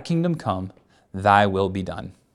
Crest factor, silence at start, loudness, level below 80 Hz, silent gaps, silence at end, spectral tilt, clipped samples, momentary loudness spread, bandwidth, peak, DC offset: 20 dB; 0 s; -22 LUFS; -54 dBFS; none; 0.25 s; -7 dB/octave; under 0.1%; 19 LU; 11 kHz; -2 dBFS; under 0.1%